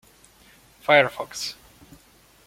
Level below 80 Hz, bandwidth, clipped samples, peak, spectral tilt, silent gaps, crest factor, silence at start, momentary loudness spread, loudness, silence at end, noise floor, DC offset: -62 dBFS; 16.5 kHz; under 0.1%; -2 dBFS; -3 dB/octave; none; 24 dB; 0.9 s; 15 LU; -22 LUFS; 0.95 s; -55 dBFS; under 0.1%